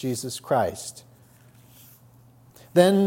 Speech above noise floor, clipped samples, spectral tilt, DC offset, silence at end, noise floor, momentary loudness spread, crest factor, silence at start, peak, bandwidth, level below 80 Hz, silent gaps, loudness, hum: 31 dB; under 0.1%; -5.5 dB/octave; under 0.1%; 0 s; -54 dBFS; 18 LU; 22 dB; 0 s; -4 dBFS; 16.5 kHz; -66 dBFS; none; -24 LUFS; none